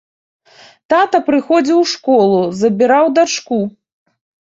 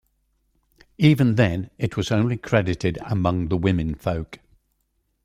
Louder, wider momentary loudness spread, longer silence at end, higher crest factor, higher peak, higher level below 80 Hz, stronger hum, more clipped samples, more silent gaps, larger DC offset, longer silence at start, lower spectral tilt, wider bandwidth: first, -13 LUFS vs -22 LUFS; second, 6 LU vs 9 LU; about the same, 0.8 s vs 0.9 s; second, 14 dB vs 20 dB; about the same, -2 dBFS vs -4 dBFS; second, -60 dBFS vs -44 dBFS; neither; neither; neither; neither; about the same, 0.9 s vs 1 s; second, -4.5 dB/octave vs -7.5 dB/octave; second, 8 kHz vs 14 kHz